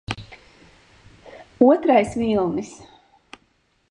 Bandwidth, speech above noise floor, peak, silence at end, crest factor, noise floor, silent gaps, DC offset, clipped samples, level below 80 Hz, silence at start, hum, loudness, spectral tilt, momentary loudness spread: 10.5 kHz; 46 dB; -2 dBFS; 1.15 s; 20 dB; -65 dBFS; none; under 0.1%; under 0.1%; -52 dBFS; 0.1 s; none; -19 LUFS; -6.5 dB/octave; 17 LU